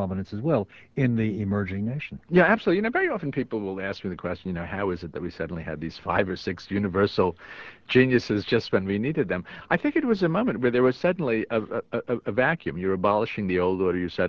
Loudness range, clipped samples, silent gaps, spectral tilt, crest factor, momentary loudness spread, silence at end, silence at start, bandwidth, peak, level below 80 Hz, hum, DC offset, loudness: 5 LU; under 0.1%; none; -8 dB/octave; 18 dB; 10 LU; 0 s; 0 s; 7 kHz; -6 dBFS; -50 dBFS; none; under 0.1%; -25 LUFS